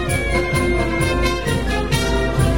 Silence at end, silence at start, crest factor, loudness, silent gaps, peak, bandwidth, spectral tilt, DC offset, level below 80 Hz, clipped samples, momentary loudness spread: 0 s; 0 s; 14 dB; -19 LUFS; none; -4 dBFS; 16.5 kHz; -5 dB/octave; 1%; -24 dBFS; under 0.1%; 2 LU